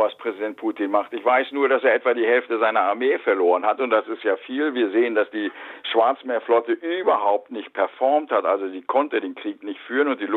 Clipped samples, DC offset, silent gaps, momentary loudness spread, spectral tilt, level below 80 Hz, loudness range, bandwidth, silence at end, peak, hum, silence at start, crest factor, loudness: under 0.1%; under 0.1%; none; 8 LU; -6 dB/octave; -78 dBFS; 3 LU; 4.2 kHz; 0 s; -6 dBFS; none; 0 s; 16 dB; -22 LUFS